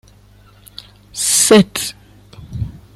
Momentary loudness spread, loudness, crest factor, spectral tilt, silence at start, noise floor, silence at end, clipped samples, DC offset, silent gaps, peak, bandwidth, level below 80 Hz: 25 LU; -13 LUFS; 18 dB; -3.5 dB/octave; 1.15 s; -46 dBFS; 0.2 s; under 0.1%; under 0.1%; none; 0 dBFS; 16 kHz; -42 dBFS